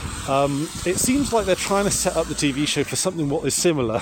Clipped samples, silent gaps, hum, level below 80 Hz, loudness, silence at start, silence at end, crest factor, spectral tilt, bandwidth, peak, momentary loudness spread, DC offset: under 0.1%; none; none; -40 dBFS; -21 LUFS; 0 s; 0 s; 14 dB; -3.5 dB/octave; 17 kHz; -6 dBFS; 4 LU; under 0.1%